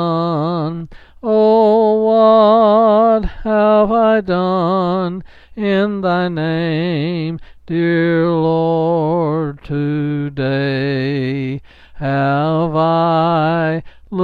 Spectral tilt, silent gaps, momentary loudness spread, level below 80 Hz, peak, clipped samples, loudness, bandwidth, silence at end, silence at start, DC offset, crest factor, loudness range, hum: -9.5 dB/octave; none; 12 LU; -38 dBFS; -2 dBFS; under 0.1%; -15 LUFS; 5.2 kHz; 0 s; 0 s; under 0.1%; 12 dB; 6 LU; none